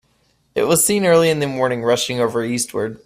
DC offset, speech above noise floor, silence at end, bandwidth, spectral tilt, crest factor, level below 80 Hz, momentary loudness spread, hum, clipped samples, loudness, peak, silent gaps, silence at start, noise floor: under 0.1%; 44 dB; 0.1 s; 16 kHz; -3.5 dB/octave; 14 dB; -54 dBFS; 8 LU; none; under 0.1%; -17 LUFS; -4 dBFS; none; 0.55 s; -61 dBFS